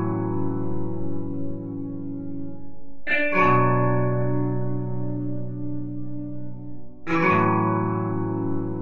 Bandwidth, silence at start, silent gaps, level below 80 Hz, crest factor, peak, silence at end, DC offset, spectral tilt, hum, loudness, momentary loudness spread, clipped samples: 6.4 kHz; 0 s; none; -46 dBFS; 16 dB; -6 dBFS; 0 s; under 0.1%; -9.5 dB/octave; none; -25 LUFS; 16 LU; under 0.1%